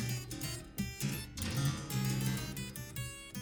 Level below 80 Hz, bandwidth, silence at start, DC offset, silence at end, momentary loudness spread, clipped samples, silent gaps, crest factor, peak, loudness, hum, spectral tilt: -52 dBFS; over 20 kHz; 0 s; under 0.1%; 0 s; 8 LU; under 0.1%; none; 16 dB; -22 dBFS; -38 LUFS; none; -4.5 dB/octave